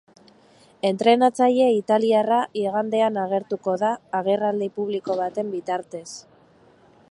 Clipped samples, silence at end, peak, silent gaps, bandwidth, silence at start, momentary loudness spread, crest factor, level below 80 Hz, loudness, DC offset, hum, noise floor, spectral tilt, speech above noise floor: under 0.1%; 0.9 s; -4 dBFS; none; 11.5 kHz; 0.85 s; 11 LU; 20 dB; -74 dBFS; -22 LUFS; under 0.1%; none; -55 dBFS; -5.5 dB/octave; 33 dB